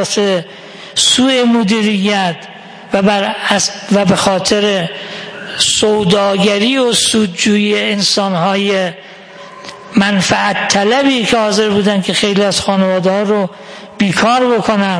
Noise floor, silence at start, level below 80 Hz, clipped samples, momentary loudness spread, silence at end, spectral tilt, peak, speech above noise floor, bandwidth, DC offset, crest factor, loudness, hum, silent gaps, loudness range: -33 dBFS; 0 s; -48 dBFS; under 0.1%; 14 LU; 0 s; -3.5 dB/octave; 0 dBFS; 21 dB; 10.5 kHz; under 0.1%; 12 dB; -12 LUFS; none; none; 2 LU